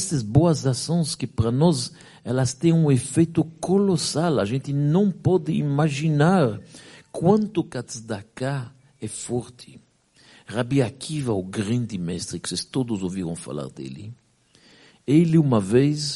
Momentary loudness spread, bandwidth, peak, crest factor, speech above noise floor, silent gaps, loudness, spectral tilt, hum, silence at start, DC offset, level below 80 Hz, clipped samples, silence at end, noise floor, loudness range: 14 LU; 11.5 kHz; -4 dBFS; 20 dB; 35 dB; none; -23 LUFS; -6 dB/octave; none; 0 s; under 0.1%; -54 dBFS; under 0.1%; 0 s; -57 dBFS; 8 LU